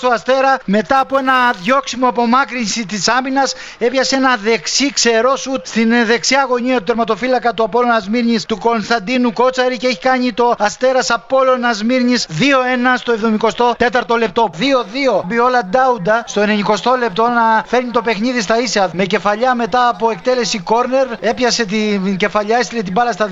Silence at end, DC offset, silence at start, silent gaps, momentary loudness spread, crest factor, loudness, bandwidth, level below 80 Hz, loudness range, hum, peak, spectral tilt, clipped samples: 0 s; under 0.1%; 0 s; none; 4 LU; 14 dB; -14 LUFS; 8 kHz; -48 dBFS; 1 LU; none; -2 dBFS; -3.5 dB/octave; under 0.1%